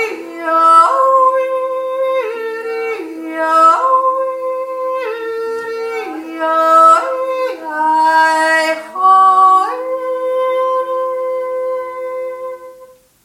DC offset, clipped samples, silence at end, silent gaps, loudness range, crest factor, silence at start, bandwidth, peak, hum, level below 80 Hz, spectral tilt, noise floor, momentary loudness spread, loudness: under 0.1%; under 0.1%; 0.4 s; none; 4 LU; 14 dB; 0 s; 16 kHz; 0 dBFS; none; -68 dBFS; -1.5 dB/octave; -42 dBFS; 14 LU; -13 LUFS